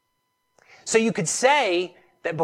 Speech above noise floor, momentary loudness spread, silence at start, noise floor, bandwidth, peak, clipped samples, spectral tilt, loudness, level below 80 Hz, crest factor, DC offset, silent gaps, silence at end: 52 dB; 15 LU; 0.85 s; -74 dBFS; 15 kHz; -6 dBFS; under 0.1%; -3 dB/octave; -22 LUFS; -72 dBFS; 18 dB; under 0.1%; none; 0 s